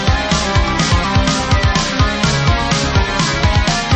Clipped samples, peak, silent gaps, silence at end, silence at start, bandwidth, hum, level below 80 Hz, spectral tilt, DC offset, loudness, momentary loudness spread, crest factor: under 0.1%; -2 dBFS; none; 0 s; 0 s; 8.8 kHz; none; -22 dBFS; -4.5 dB/octave; under 0.1%; -14 LUFS; 1 LU; 12 dB